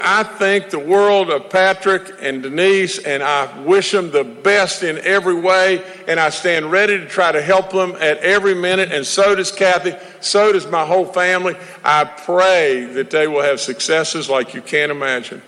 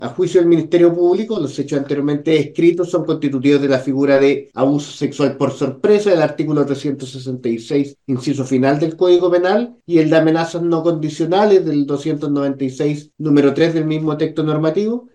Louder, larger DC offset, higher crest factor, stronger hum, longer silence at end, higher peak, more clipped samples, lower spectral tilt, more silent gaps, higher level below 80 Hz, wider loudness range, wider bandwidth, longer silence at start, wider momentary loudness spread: about the same, -15 LUFS vs -16 LUFS; neither; about the same, 14 dB vs 16 dB; neither; about the same, 0.1 s vs 0.15 s; about the same, -2 dBFS vs 0 dBFS; neither; second, -3 dB/octave vs -7 dB/octave; neither; about the same, -60 dBFS vs -62 dBFS; about the same, 1 LU vs 3 LU; first, 12 kHz vs 9.4 kHz; about the same, 0 s vs 0 s; about the same, 6 LU vs 8 LU